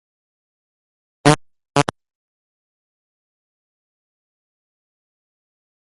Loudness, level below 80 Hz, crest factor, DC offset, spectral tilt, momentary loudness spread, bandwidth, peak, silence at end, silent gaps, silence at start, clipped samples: -19 LUFS; -56 dBFS; 26 dB; under 0.1%; -4.5 dB/octave; 6 LU; 6 kHz; 0 dBFS; 4.1 s; none; 1.25 s; under 0.1%